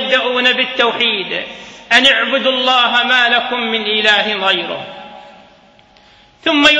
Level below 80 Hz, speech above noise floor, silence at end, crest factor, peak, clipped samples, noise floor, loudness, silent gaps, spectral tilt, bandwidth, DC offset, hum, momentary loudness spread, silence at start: -56 dBFS; 33 dB; 0 s; 16 dB; 0 dBFS; under 0.1%; -47 dBFS; -12 LUFS; none; -2 dB/octave; 11 kHz; under 0.1%; none; 13 LU; 0 s